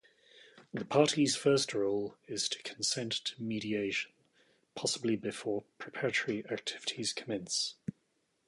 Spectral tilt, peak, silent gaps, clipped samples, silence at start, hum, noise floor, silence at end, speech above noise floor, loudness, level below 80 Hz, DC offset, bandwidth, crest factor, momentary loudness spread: -3.5 dB/octave; -12 dBFS; none; under 0.1%; 0.35 s; none; -77 dBFS; 0.55 s; 43 dB; -33 LUFS; -74 dBFS; under 0.1%; 11.5 kHz; 22 dB; 11 LU